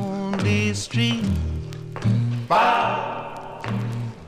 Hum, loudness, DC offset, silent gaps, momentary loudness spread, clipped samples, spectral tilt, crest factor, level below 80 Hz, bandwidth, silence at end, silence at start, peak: none; -23 LUFS; 0.2%; none; 13 LU; under 0.1%; -5.5 dB/octave; 16 dB; -40 dBFS; 12 kHz; 0 s; 0 s; -6 dBFS